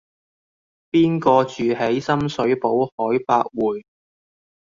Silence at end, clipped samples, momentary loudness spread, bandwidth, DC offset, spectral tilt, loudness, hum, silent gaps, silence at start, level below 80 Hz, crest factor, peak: 0.9 s; under 0.1%; 6 LU; 7.4 kHz; under 0.1%; -7 dB/octave; -20 LUFS; none; 2.92-2.98 s; 0.95 s; -56 dBFS; 18 dB; -2 dBFS